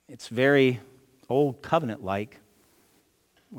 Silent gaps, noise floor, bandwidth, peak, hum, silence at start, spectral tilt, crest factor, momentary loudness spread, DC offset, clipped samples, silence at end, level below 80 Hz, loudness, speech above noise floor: none; -66 dBFS; 17 kHz; -8 dBFS; none; 0.1 s; -6.5 dB/octave; 20 dB; 15 LU; under 0.1%; under 0.1%; 0 s; -70 dBFS; -25 LUFS; 41 dB